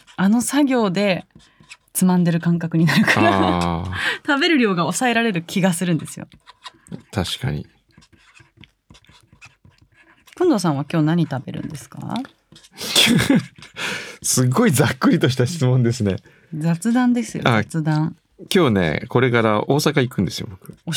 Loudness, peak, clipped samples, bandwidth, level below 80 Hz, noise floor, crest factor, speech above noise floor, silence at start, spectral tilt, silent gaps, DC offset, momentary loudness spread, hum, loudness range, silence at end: -19 LUFS; 0 dBFS; under 0.1%; 19.5 kHz; -54 dBFS; -54 dBFS; 20 dB; 35 dB; 0.2 s; -5 dB/octave; none; under 0.1%; 14 LU; none; 10 LU; 0 s